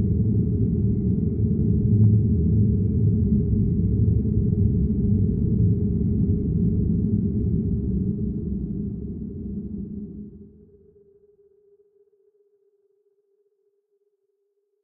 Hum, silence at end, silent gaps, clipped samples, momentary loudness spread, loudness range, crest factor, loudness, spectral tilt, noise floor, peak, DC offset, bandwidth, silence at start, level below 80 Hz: none; 4.35 s; none; under 0.1%; 12 LU; 16 LU; 16 dB; -23 LUFS; -16.5 dB/octave; -73 dBFS; -8 dBFS; under 0.1%; 1 kHz; 0 s; -34 dBFS